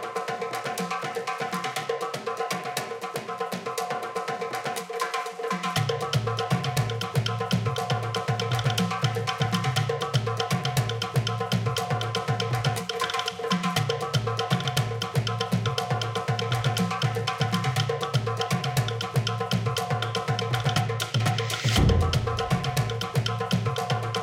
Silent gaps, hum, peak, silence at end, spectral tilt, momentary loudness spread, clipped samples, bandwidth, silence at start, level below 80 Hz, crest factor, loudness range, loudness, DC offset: none; none; -8 dBFS; 0 s; -5 dB/octave; 5 LU; under 0.1%; 16.5 kHz; 0 s; -44 dBFS; 18 dB; 5 LU; -27 LUFS; under 0.1%